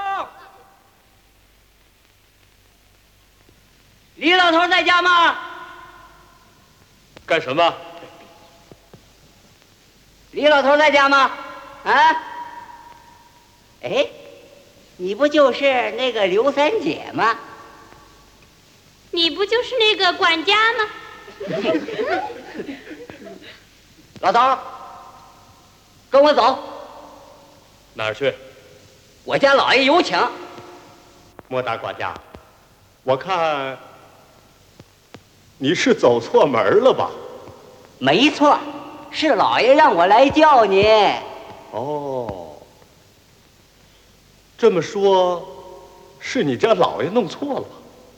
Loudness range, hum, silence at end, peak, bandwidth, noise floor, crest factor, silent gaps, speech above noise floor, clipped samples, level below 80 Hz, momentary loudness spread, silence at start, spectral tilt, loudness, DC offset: 10 LU; none; 0.45 s; 0 dBFS; 18 kHz; -55 dBFS; 20 dB; none; 39 dB; under 0.1%; -56 dBFS; 23 LU; 0 s; -4 dB/octave; -17 LUFS; under 0.1%